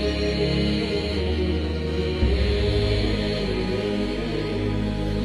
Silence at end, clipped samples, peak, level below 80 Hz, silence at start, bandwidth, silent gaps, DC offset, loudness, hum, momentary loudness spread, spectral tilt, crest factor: 0 s; under 0.1%; -10 dBFS; -28 dBFS; 0 s; 11.5 kHz; none; 0.1%; -24 LUFS; none; 4 LU; -7 dB/octave; 14 dB